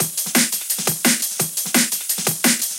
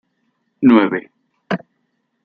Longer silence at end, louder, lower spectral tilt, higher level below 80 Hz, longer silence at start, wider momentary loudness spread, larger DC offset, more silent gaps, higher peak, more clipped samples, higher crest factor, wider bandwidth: second, 0 s vs 0.7 s; about the same, -18 LUFS vs -16 LUFS; second, -1.5 dB/octave vs -8.5 dB/octave; second, -74 dBFS vs -60 dBFS; second, 0 s vs 0.6 s; second, 3 LU vs 13 LU; neither; neither; about the same, -2 dBFS vs -2 dBFS; neither; about the same, 18 dB vs 16 dB; first, 17 kHz vs 5.2 kHz